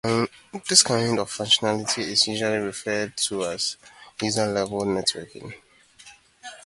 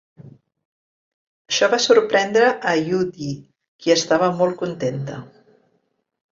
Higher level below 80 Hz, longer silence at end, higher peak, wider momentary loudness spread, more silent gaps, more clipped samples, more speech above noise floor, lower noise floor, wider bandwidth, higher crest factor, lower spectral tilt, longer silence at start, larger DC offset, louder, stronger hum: about the same, -60 dBFS vs -64 dBFS; second, 0.05 s vs 1.05 s; about the same, -2 dBFS vs -2 dBFS; first, 22 LU vs 15 LU; second, none vs 0.65-1.45 s, 3.68-3.79 s; neither; second, 27 dB vs 50 dB; second, -51 dBFS vs -69 dBFS; first, 11.5 kHz vs 7.6 kHz; first, 24 dB vs 18 dB; second, -2.5 dB/octave vs -4 dB/octave; second, 0.05 s vs 0.25 s; neither; second, -23 LUFS vs -19 LUFS; neither